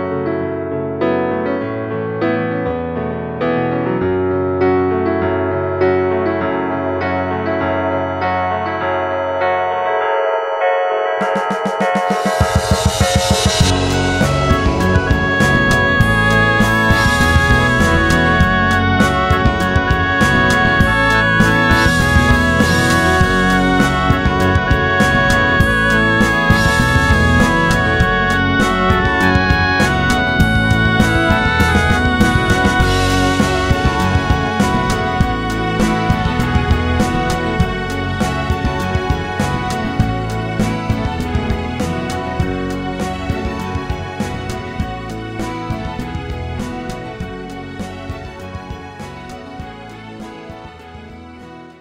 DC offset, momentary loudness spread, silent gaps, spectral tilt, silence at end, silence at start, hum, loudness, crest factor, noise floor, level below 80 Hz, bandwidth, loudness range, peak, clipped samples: under 0.1%; 12 LU; none; -5.5 dB/octave; 0.1 s; 0 s; none; -15 LUFS; 16 dB; -36 dBFS; -26 dBFS; 16 kHz; 12 LU; 0 dBFS; under 0.1%